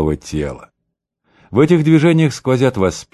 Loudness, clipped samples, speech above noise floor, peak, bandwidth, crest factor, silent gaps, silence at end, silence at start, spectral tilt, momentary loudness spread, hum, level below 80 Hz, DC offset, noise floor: -15 LUFS; under 0.1%; 61 dB; 0 dBFS; 12 kHz; 14 dB; none; 0.1 s; 0 s; -7 dB/octave; 12 LU; none; -36 dBFS; under 0.1%; -75 dBFS